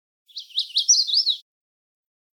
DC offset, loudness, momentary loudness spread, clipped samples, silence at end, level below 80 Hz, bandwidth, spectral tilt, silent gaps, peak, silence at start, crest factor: under 0.1%; -19 LUFS; 19 LU; under 0.1%; 0.95 s; under -90 dBFS; 18 kHz; 14 dB/octave; none; -6 dBFS; 0.35 s; 18 dB